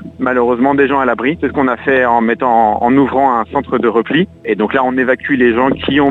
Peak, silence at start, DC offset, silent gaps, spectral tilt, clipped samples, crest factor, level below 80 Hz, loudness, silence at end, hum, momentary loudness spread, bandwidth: 0 dBFS; 0 s; under 0.1%; none; -8 dB/octave; under 0.1%; 12 dB; -44 dBFS; -13 LUFS; 0 s; none; 4 LU; 4.2 kHz